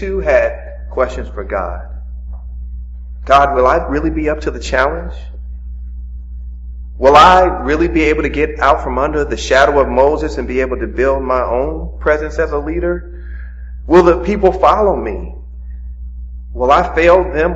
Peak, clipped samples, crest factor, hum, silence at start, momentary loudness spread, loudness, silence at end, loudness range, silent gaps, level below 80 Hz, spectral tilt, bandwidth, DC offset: 0 dBFS; 0.2%; 14 dB; none; 0 s; 20 LU; -13 LUFS; 0 s; 6 LU; none; -24 dBFS; -6 dB/octave; 8 kHz; under 0.1%